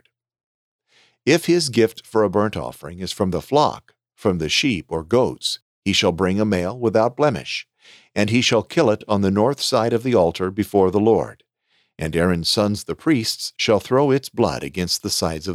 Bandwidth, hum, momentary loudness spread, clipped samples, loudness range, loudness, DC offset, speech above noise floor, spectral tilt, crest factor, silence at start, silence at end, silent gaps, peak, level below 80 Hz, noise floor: 16 kHz; none; 8 LU; under 0.1%; 2 LU; -20 LUFS; under 0.1%; 47 dB; -4.5 dB/octave; 16 dB; 1.25 s; 0 s; 5.62-5.82 s; -4 dBFS; -48 dBFS; -66 dBFS